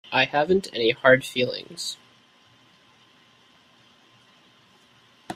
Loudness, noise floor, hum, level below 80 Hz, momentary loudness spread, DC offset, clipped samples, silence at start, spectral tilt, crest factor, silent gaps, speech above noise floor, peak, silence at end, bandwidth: -22 LUFS; -57 dBFS; none; -64 dBFS; 14 LU; under 0.1%; under 0.1%; 0.1 s; -4 dB/octave; 24 dB; none; 35 dB; -4 dBFS; 0 s; 15.5 kHz